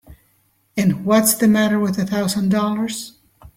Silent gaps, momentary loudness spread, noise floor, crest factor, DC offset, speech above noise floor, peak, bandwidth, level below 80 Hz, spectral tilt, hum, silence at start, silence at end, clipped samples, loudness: none; 12 LU; -61 dBFS; 16 dB; under 0.1%; 44 dB; -2 dBFS; 16.5 kHz; -54 dBFS; -5 dB/octave; none; 0.1 s; 0.1 s; under 0.1%; -18 LUFS